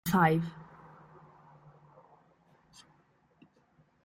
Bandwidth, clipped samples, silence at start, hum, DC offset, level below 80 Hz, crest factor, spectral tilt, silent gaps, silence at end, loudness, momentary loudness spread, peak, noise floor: 15.5 kHz; under 0.1%; 0.05 s; none; under 0.1%; -66 dBFS; 22 dB; -6.5 dB/octave; none; 3.4 s; -29 LUFS; 30 LU; -12 dBFS; -68 dBFS